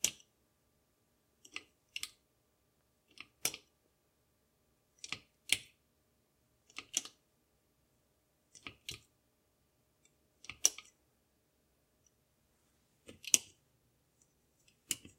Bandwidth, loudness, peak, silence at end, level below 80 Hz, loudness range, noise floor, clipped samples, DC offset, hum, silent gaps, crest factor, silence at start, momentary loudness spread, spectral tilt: 16 kHz; -37 LUFS; -2 dBFS; 0.2 s; -78 dBFS; 8 LU; -77 dBFS; under 0.1%; under 0.1%; none; none; 44 dB; 0.05 s; 22 LU; 1.5 dB/octave